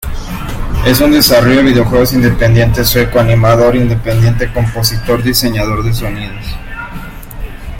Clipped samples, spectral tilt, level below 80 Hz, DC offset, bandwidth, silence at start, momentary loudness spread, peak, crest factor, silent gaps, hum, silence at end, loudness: under 0.1%; -5.5 dB/octave; -22 dBFS; under 0.1%; 17 kHz; 0 s; 17 LU; 0 dBFS; 10 dB; none; none; 0 s; -10 LUFS